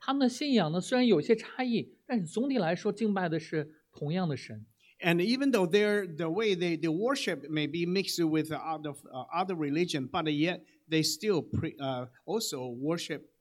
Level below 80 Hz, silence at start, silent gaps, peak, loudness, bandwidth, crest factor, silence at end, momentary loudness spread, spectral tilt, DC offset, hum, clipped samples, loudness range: -72 dBFS; 0 s; none; -10 dBFS; -31 LUFS; 16.5 kHz; 20 dB; 0.2 s; 9 LU; -5 dB/octave; under 0.1%; none; under 0.1%; 3 LU